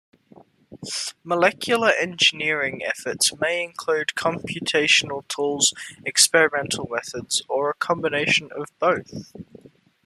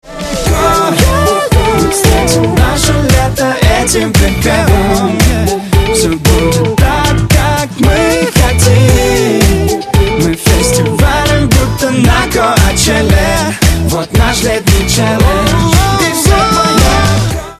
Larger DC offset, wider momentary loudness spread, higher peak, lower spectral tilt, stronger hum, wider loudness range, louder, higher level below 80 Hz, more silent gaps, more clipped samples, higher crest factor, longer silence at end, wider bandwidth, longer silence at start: neither; first, 12 LU vs 3 LU; about the same, -2 dBFS vs 0 dBFS; second, -1.5 dB/octave vs -4.5 dB/octave; neither; about the same, 2 LU vs 1 LU; second, -21 LUFS vs -9 LUFS; second, -66 dBFS vs -16 dBFS; neither; second, under 0.1% vs 0.5%; first, 22 dB vs 8 dB; first, 0.6 s vs 0.05 s; about the same, 13.5 kHz vs 14.5 kHz; first, 0.7 s vs 0.05 s